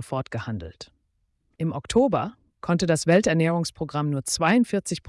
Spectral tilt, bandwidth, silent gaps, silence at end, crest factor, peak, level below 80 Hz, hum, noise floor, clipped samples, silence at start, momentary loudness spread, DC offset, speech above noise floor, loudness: -5.5 dB/octave; 12 kHz; none; 0.1 s; 16 dB; -8 dBFS; -52 dBFS; none; -71 dBFS; under 0.1%; 0 s; 14 LU; under 0.1%; 48 dB; -24 LUFS